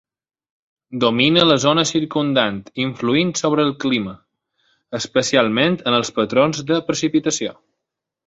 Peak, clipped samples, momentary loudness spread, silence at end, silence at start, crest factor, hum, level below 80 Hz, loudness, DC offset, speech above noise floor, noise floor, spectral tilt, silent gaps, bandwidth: -2 dBFS; under 0.1%; 10 LU; 0.75 s; 0.9 s; 18 dB; none; -58 dBFS; -18 LUFS; under 0.1%; 64 dB; -82 dBFS; -4 dB/octave; none; 8 kHz